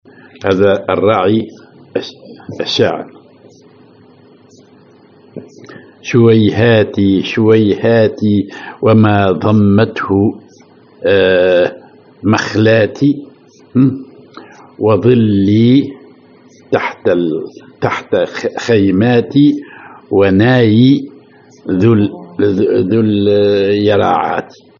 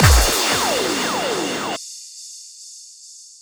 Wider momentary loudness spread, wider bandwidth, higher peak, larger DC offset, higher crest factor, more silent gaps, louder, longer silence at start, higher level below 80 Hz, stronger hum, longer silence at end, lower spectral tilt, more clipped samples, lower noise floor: second, 13 LU vs 22 LU; second, 7.2 kHz vs over 20 kHz; about the same, 0 dBFS vs 0 dBFS; neither; second, 12 dB vs 20 dB; neither; first, -12 LUFS vs -19 LUFS; first, 0.4 s vs 0 s; second, -54 dBFS vs -26 dBFS; neither; first, 0.35 s vs 0.2 s; first, -7.5 dB/octave vs -3 dB/octave; neither; about the same, -44 dBFS vs -42 dBFS